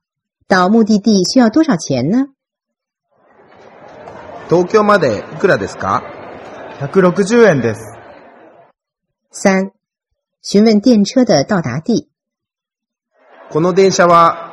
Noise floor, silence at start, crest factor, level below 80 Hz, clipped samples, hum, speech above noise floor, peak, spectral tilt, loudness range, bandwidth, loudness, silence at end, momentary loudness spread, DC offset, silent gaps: -84 dBFS; 0.5 s; 14 dB; -54 dBFS; under 0.1%; none; 72 dB; 0 dBFS; -5.5 dB/octave; 3 LU; 11.5 kHz; -12 LUFS; 0 s; 21 LU; under 0.1%; none